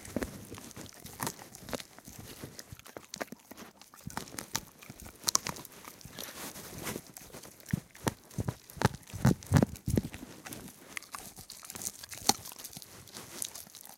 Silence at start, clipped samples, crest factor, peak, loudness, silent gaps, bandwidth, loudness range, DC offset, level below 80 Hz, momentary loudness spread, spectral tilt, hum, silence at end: 0 s; under 0.1%; 36 dB; -2 dBFS; -36 LUFS; none; 17 kHz; 10 LU; under 0.1%; -54 dBFS; 18 LU; -4 dB/octave; none; 0 s